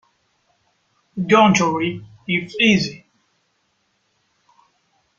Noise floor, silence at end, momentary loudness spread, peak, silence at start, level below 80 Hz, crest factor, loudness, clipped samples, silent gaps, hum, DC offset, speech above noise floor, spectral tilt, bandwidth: -67 dBFS; 2.2 s; 15 LU; -2 dBFS; 1.15 s; -58 dBFS; 20 dB; -17 LUFS; under 0.1%; none; none; under 0.1%; 50 dB; -4.5 dB/octave; 7.6 kHz